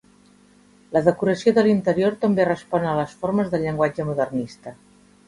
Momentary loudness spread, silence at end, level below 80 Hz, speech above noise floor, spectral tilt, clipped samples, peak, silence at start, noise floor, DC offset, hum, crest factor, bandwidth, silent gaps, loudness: 8 LU; 0.55 s; -56 dBFS; 33 dB; -7.5 dB/octave; under 0.1%; -2 dBFS; 0.9 s; -54 dBFS; under 0.1%; 50 Hz at -45 dBFS; 20 dB; 11.5 kHz; none; -21 LUFS